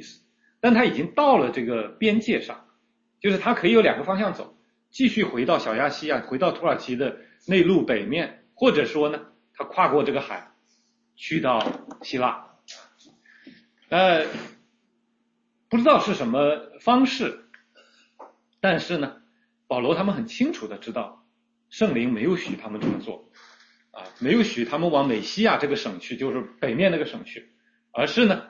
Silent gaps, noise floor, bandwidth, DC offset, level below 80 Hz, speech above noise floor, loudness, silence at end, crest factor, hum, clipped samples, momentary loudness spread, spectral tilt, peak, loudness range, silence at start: none; -71 dBFS; 7.4 kHz; under 0.1%; -64 dBFS; 48 dB; -23 LUFS; 0.05 s; 20 dB; none; under 0.1%; 18 LU; -6 dB/octave; -4 dBFS; 5 LU; 0 s